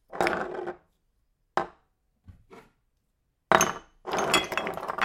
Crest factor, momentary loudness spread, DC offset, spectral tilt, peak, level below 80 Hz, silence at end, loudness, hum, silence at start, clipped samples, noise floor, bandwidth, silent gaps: 30 dB; 17 LU; under 0.1%; -2.5 dB/octave; 0 dBFS; -60 dBFS; 0 s; -27 LUFS; none; 0.1 s; under 0.1%; -75 dBFS; 16.5 kHz; none